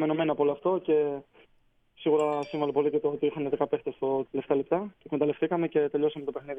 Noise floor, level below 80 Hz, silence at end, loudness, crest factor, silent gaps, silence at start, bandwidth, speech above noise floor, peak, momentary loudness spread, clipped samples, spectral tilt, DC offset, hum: -66 dBFS; -68 dBFS; 0 s; -28 LUFS; 16 dB; none; 0 s; 8.2 kHz; 38 dB; -12 dBFS; 5 LU; under 0.1%; -8 dB/octave; under 0.1%; none